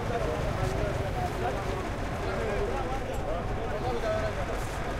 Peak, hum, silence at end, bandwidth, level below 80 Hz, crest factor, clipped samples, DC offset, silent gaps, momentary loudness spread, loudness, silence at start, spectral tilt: -16 dBFS; none; 0 s; 16 kHz; -36 dBFS; 14 dB; under 0.1%; under 0.1%; none; 3 LU; -32 LUFS; 0 s; -6 dB/octave